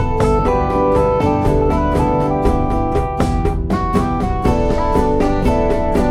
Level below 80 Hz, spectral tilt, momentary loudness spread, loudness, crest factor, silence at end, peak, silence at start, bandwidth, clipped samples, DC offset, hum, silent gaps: -22 dBFS; -8 dB/octave; 3 LU; -16 LUFS; 14 dB; 0 s; -2 dBFS; 0 s; 13.5 kHz; under 0.1%; under 0.1%; none; none